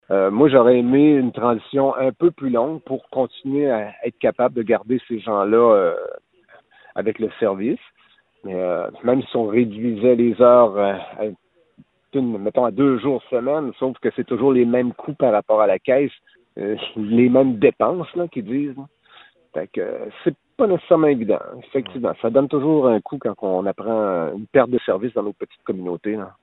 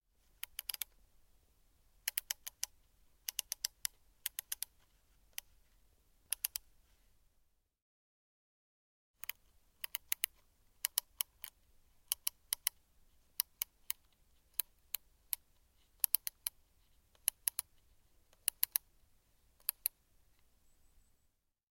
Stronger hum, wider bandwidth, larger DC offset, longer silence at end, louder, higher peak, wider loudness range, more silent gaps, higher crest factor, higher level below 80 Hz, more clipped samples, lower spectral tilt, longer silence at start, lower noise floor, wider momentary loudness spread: neither; second, 4.1 kHz vs 16.5 kHz; neither; second, 0.15 s vs 1.8 s; first, -19 LUFS vs -40 LUFS; first, 0 dBFS vs -6 dBFS; second, 4 LU vs 8 LU; second, none vs 7.82-9.14 s; second, 18 dB vs 38 dB; first, -62 dBFS vs -72 dBFS; neither; first, -11 dB/octave vs 3.5 dB/octave; second, 0.1 s vs 0.75 s; second, -57 dBFS vs -79 dBFS; about the same, 13 LU vs 11 LU